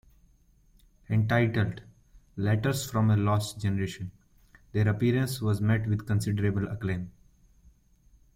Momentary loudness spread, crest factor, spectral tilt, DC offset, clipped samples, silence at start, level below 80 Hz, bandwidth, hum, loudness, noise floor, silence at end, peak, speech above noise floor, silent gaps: 10 LU; 18 dB; -6.5 dB/octave; under 0.1%; under 0.1%; 1.1 s; -54 dBFS; 16 kHz; none; -28 LUFS; -62 dBFS; 1.25 s; -10 dBFS; 35 dB; none